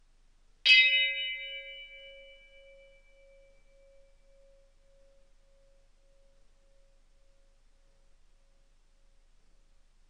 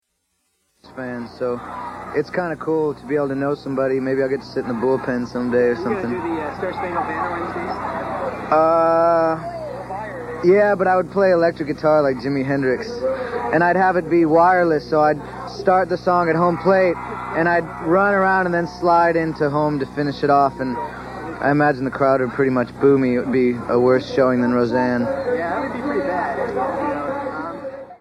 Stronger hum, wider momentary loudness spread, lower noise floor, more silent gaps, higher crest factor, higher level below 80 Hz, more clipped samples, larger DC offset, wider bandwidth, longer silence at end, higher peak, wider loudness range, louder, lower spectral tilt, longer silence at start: neither; first, 29 LU vs 11 LU; second, -63 dBFS vs -71 dBFS; neither; first, 28 dB vs 16 dB; second, -62 dBFS vs -48 dBFS; neither; neither; second, 10 kHz vs 11.5 kHz; first, 8 s vs 0.05 s; second, -8 dBFS vs -2 dBFS; first, 25 LU vs 5 LU; second, -23 LUFS vs -19 LUFS; second, 2 dB/octave vs -7.5 dB/octave; second, 0.65 s vs 0.85 s